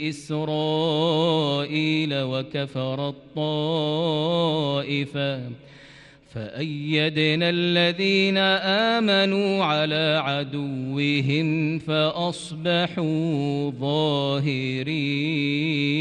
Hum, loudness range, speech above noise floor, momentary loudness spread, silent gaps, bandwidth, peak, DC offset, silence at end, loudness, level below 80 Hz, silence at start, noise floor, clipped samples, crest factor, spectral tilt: none; 5 LU; 25 dB; 9 LU; none; 10.5 kHz; -8 dBFS; under 0.1%; 0 s; -23 LUFS; -62 dBFS; 0 s; -49 dBFS; under 0.1%; 16 dB; -6 dB/octave